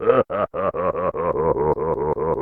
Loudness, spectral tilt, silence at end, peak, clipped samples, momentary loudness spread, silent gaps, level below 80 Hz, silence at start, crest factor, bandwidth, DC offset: -22 LUFS; -10 dB/octave; 0 s; -4 dBFS; under 0.1%; 4 LU; none; -42 dBFS; 0 s; 16 dB; 3.8 kHz; under 0.1%